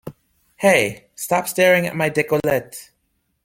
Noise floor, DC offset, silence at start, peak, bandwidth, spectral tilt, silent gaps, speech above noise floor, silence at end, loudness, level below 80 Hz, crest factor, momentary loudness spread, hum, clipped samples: -69 dBFS; under 0.1%; 0.05 s; -2 dBFS; 17 kHz; -4 dB/octave; none; 51 dB; 0.6 s; -18 LUFS; -56 dBFS; 20 dB; 18 LU; none; under 0.1%